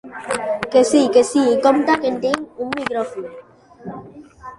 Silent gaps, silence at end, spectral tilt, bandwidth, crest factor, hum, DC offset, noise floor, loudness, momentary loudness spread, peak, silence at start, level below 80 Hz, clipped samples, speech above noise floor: none; 0.05 s; -4 dB/octave; 11.5 kHz; 16 dB; none; under 0.1%; -38 dBFS; -18 LUFS; 21 LU; -2 dBFS; 0.05 s; -56 dBFS; under 0.1%; 22 dB